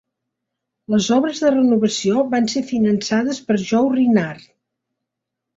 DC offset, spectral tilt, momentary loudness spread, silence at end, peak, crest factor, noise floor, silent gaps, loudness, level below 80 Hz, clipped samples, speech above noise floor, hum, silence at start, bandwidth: under 0.1%; -5 dB/octave; 5 LU; 1.2 s; -4 dBFS; 14 dB; -81 dBFS; none; -18 LUFS; -60 dBFS; under 0.1%; 64 dB; none; 0.9 s; 8 kHz